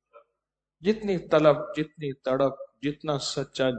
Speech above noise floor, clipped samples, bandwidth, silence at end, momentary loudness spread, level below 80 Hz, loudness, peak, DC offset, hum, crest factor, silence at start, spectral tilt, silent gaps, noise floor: 59 dB; under 0.1%; 9 kHz; 0 s; 12 LU; -60 dBFS; -27 LUFS; -6 dBFS; under 0.1%; none; 20 dB; 0.15 s; -5.5 dB/octave; none; -85 dBFS